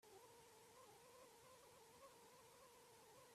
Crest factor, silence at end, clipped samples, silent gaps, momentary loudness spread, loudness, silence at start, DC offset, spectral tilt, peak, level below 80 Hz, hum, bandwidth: 14 dB; 0 s; under 0.1%; none; 1 LU; -66 LUFS; 0 s; under 0.1%; -2.5 dB/octave; -52 dBFS; under -90 dBFS; none; 15.5 kHz